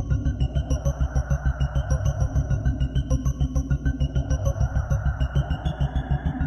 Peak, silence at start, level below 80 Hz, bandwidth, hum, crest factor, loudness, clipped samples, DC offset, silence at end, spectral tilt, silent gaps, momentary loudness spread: -10 dBFS; 0 s; -26 dBFS; 6.6 kHz; none; 14 dB; -26 LUFS; under 0.1%; under 0.1%; 0 s; -7 dB/octave; none; 2 LU